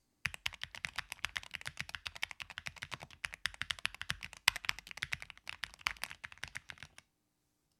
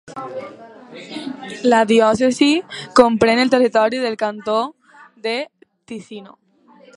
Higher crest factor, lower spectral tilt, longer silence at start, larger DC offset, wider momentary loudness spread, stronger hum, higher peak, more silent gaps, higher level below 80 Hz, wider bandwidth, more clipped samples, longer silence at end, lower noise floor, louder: first, 40 dB vs 18 dB; second, -0.5 dB/octave vs -4.5 dB/octave; first, 0.25 s vs 0.05 s; neither; second, 11 LU vs 21 LU; neither; second, -4 dBFS vs 0 dBFS; neither; second, -64 dBFS vs -56 dBFS; first, 16.5 kHz vs 11 kHz; neither; first, 0.95 s vs 0.7 s; first, -81 dBFS vs -49 dBFS; second, -40 LUFS vs -16 LUFS